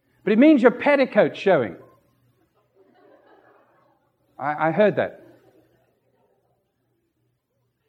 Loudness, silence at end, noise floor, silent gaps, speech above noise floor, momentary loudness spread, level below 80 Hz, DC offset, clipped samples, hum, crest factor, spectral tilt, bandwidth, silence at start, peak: -19 LUFS; 2.75 s; -72 dBFS; none; 54 dB; 14 LU; -76 dBFS; under 0.1%; under 0.1%; none; 22 dB; -8 dB/octave; 7.8 kHz; 0.25 s; -2 dBFS